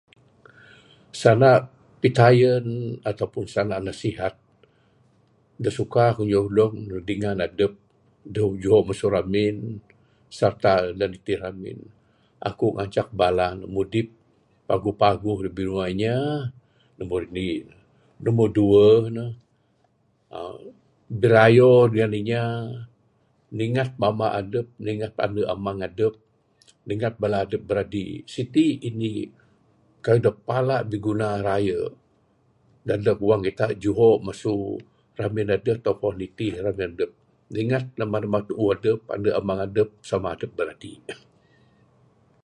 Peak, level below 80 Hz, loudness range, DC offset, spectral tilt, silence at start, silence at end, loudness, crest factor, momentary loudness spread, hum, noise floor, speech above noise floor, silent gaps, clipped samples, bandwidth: -2 dBFS; -52 dBFS; 7 LU; under 0.1%; -7.5 dB/octave; 1.15 s; 1.3 s; -23 LUFS; 22 dB; 16 LU; none; -65 dBFS; 43 dB; none; under 0.1%; 11 kHz